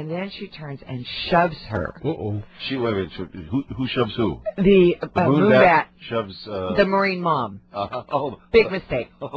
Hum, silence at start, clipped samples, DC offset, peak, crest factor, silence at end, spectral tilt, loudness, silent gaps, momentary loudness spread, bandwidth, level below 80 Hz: none; 0 s; under 0.1%; under 0.1%; -2 dBFS; 18 dB; 0 s; -8.5 dB/octave; -21 LUFS; none; 15 LU; 6.6 kHz; -46 dBFS